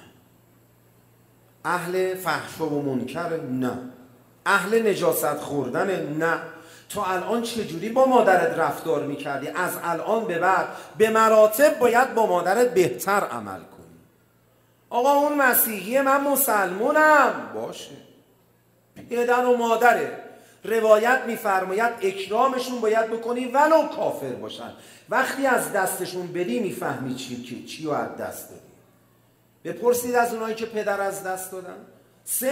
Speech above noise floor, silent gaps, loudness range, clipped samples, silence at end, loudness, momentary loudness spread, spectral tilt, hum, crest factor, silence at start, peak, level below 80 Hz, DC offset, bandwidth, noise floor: 38 dB; none; 8 LU; under 0.1%; 0 s; -22 LUFS; 16 LU; -4 dB/octave; none; 20 dB; 1.65 s; -2 dBFS; -70 dBFS; under 0.1%; 16 kHz; -61 dBFS